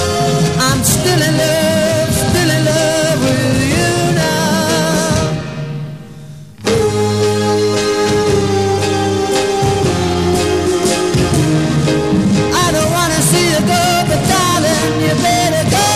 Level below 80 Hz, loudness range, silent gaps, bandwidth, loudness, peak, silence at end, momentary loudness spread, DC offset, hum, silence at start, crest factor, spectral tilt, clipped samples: -34 dBFS; 3 LU; none; 15.5 kHz; -13 LUFS; 0 dBFS; 0 s; 3 LU; 0.6%; none; 0 s; 14 dB; -4.5 dB/octave; under 0.1%